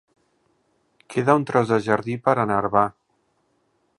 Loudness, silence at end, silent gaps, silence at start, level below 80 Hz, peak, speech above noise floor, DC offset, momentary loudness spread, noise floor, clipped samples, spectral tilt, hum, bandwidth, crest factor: -21 LUFS; 1.1 s; none; 1.1 s; -60 dBFS; -2 dBFS; 48 dB; under 0.1%; 5 LU; -68 dBFS; under 0.1%; -7 dB/octave; none; 11.5 kHz; 22 dB